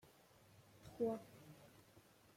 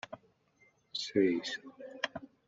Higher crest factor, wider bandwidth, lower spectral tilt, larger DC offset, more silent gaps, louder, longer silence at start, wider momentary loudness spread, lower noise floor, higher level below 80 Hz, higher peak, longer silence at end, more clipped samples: about the same, 22 dB vs 22 dB; first, 16.5 kHz vs 7.8 kHz; first, -6.5 dB/octave vs -3 dB/octave; neither; neither; second, -45 LUFS vs -35 LUFS; first, 0.6 s vs 0.1 s; first, 24 LU vs 19 LU; about the same, -68 dBFS vs -69 dBFS; about the same, -80 dBFS vs -76 dBFS; second, -30 dBFS vs -16 dBFS; first, 0.35 s vs 0.2 s; neither